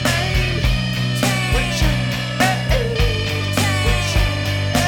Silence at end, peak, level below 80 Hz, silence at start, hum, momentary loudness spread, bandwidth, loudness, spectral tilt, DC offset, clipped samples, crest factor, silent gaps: 0 s; -2 dBFS; -24 dBFS; 0 s; none; 3 LU; 19 kHz; -18 LUFS; -4.5 dB/octave; under 0.1%; under 0.1%; 16 dB; none